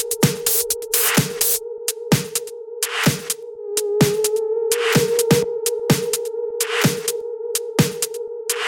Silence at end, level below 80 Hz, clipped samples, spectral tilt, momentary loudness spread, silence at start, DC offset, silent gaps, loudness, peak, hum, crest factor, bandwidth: 0 s; -54 dBFS; under 0.1%; -3.5 dB/octave; 8 LU; 0 s; under 0.1%; none; -20 LUFS; -2 dBFS; none; 20 dB; 17.5 kHz